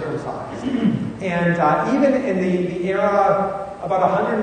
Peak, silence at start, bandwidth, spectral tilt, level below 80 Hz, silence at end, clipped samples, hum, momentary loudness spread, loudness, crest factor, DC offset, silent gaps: -2 dBFS; 0 s; 9.6 kHz; -7.5 dB/octave; -50 dBFS; 0 s; under 0.1%; none; 9 LU; -20 LUFS; 16 dB; under 0.1%; none